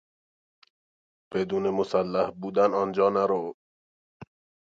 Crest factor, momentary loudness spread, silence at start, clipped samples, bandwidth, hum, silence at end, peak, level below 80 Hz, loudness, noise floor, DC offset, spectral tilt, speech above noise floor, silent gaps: 18 dB; 7 LU; 1.3 s; under 0.1%; 7.6 kHz; none; 0.45 s; -10 dBFS; -66 dBFS; -26 LUFS; under -90 dBFS; under 0.1%; -7 dB/octave; over 65 dB; 3.54-4.20 s